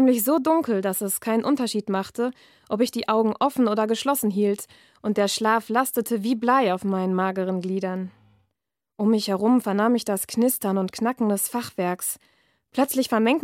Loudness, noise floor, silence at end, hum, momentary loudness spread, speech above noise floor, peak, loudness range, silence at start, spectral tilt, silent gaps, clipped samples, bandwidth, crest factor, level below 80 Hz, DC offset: -23 LUFS; -82 dBFS; 0 s; none; 7 LU; 59 dB; -6 dBFS; 2 LU; 0 s; -4.5 dB/octave; none; under 0.1%; 16.5 kHz; 16 dB; -70 dBFS; under 0.1%